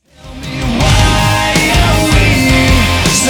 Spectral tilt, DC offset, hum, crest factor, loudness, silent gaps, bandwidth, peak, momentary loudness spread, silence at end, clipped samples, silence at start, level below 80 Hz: -4 dB/octave; under 0.1%; none; 10 dB; -10 LUFS; none; over 20 kHz; 0 dBFS; 9 LU; 0 s; under 0.1%; 0.25 s; -18 dBFS